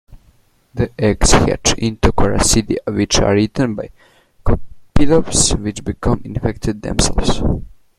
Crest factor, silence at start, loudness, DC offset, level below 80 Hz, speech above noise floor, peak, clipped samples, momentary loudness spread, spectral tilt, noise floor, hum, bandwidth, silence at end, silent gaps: 16 dB; 0.15 s; -16 LUFS; under 0.1%; -24 dBFS; 39 dB; 0 dBFS; under 0.1%; 10 LU; -4 dB/octave; -53 dBFS; none; 14 kHz; 0.3 s; none